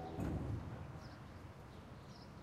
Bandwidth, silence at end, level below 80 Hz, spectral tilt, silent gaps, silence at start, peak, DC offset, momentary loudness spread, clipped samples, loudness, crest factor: 15 kHz; 0 s; -56 dBFS; -7.5 dB/octave; none; 0 s; -30 dBFS; under 0.1%; 12 LU; under 0.1%; -48 LUFS; 16 dB